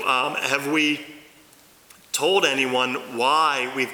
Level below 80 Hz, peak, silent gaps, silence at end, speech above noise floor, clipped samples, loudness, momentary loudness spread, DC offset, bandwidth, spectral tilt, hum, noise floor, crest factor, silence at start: -72 dBFS; -6 dBFS; none; 0 s; 30 dB; under 0.1%; -21 LUFS; 7 LU; under 0.1%; over 20 kHz; -2 dB/octave; none; -53 dBFS; 18 dB; 0 s